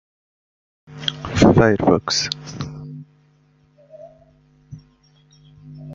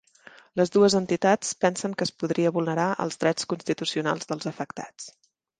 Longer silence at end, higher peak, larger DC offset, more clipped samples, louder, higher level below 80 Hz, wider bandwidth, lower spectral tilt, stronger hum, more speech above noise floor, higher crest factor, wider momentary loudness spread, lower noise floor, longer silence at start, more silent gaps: second, 0 s vs 0.5 s; first, -2 dBFS vs -8 dBFS; neither; neither; first, -18 LUFS vs -25 LUFS; first, -44 dBFS vs -68 dBFS; second, 7.8 kHz vs 10 kHz; about the same, -5 dB/octave vs -4.5 dB/octave; neither; first, 39 dB vs 27 dB; about the same, 20 dB vs 18 dB; first, 24 LU vs 14 LU; first, -57 dBFS vs -52 dBFS; first, 0.9 s vs 0.55 s; neither